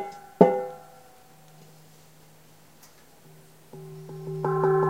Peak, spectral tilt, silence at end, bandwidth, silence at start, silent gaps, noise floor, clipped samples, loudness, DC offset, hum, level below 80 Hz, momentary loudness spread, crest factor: 0 dBFS; -8.5 dB/octave; 0 s; 16 kHz; 0 s; none; -55 dBFS; under 0.1%; -25 LUFS; 0.1%; none; -68 dBFS; 25 LU; 28 dB